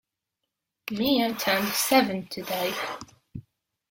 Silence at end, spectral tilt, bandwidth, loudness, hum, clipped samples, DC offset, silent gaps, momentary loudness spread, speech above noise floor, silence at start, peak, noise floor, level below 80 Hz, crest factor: 0.5 s; -3 dB/octave; 17 kHz; -25 LUFS; none; under 0.1%; under 0.1%; none; 22 LU; 58 dB; 0.85 s; -8 dBFS; -84 dBFS; -62 dBFS; 22 dB